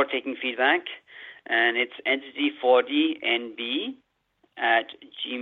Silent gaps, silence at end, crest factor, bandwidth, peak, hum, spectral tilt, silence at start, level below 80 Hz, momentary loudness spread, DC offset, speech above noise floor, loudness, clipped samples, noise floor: none; 0 s; 20 dB; 4.4 kHz; -6 dBFS; none; 1.5 dB/octave; 0 s; -80 dBFS; 16 LU; under 0.1%; 43 dB; -24 LUFS; under 0.1%; -69 dBFS